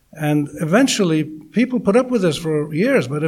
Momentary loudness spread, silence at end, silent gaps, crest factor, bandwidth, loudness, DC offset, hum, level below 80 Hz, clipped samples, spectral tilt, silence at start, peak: 6 LU; 0 s; none; 16 dB; 16 kHz; -18 LUFS; under 0.1%; none; -54 dBFS; under 0.1%; -5.5 dB/octave; 0.15 s; -2 dBFS